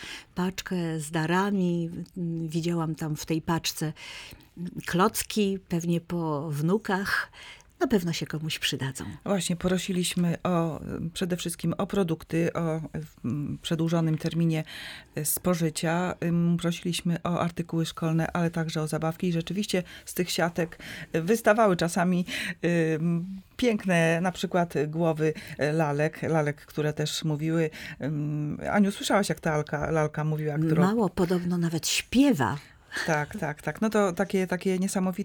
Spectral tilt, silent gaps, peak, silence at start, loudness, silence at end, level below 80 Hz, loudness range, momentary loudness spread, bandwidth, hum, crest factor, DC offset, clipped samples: -5.5 dB/octave; none; -8 dBFS; 0 s; -28 LUFS; 0 s; -56 dBFS; 3 LU; 8 LU; over 20 kHz; none; 18 dB; under 0.1%; under 0.1%